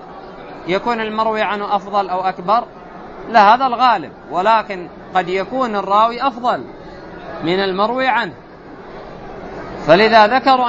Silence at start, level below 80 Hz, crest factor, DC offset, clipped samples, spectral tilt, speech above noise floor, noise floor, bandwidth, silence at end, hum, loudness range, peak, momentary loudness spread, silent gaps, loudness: 0 s; -48 dBFS; 16 dB; under 0.1%; under 0.1%; -5.5 dB/octave; 21 dB; -36 dBFS; 8 kHz; 0 s; none; 5 LU; 0 dBFS; 23 LU; none; -16 LUFS